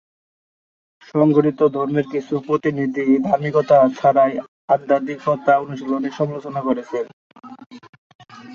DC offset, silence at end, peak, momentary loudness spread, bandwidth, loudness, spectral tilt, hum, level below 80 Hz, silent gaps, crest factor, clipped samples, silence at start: under 0.1%; 0 s; -2 dBFS; 9 LU; 7 kHz; -19 LUFS; -8.5 dB/octave; none; -64 dBFS; 4.48-4.68 s, 7.13-7.30 s, 7.66-7.70 s, 7.89-8.19 s; 18 dB; under 0.1%; 1.15 s